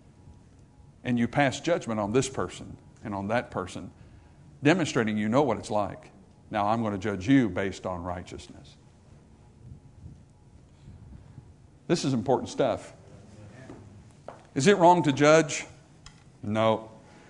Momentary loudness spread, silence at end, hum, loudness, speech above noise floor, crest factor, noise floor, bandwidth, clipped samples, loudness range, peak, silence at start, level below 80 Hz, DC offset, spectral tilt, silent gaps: 26 LU; 0.3 s; none; -26 LUFS; 29 dB; 22 dB; -54 dBFS; 11 kHz; under 0.1%; 8 LU; -6 dBFS; 0.25 s; -58 dBFS; under 0.1%; -5.5 dB/octave; none